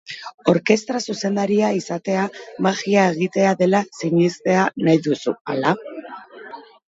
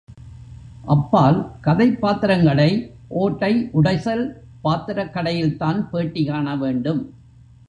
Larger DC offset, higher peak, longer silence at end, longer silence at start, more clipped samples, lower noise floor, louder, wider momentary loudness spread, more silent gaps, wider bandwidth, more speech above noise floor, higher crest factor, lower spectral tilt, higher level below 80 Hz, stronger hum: neither; about the same, 0 dBFS vs -2 dBFS; second, 0.3 s vs 0.6 s; about the same, 0.1 s vs 0.1 s; neither; second, -39 dBFS vs -47 dBFS; about the same, -20 LUFS vs -20 LUFS; first, 17 LU vs 10 LU; first, 0.34-0.38 s, 5.41-5.45 s vs none; about the same, 8 kHz vs 8.4 kHz; second, 20 dB vs 28 dB; about the same, 20 dB vs 18 dB; second, -5.5 dB/octave vs -8.5 dB/octave; second, -66 dBFS vs -46 dBFS; neither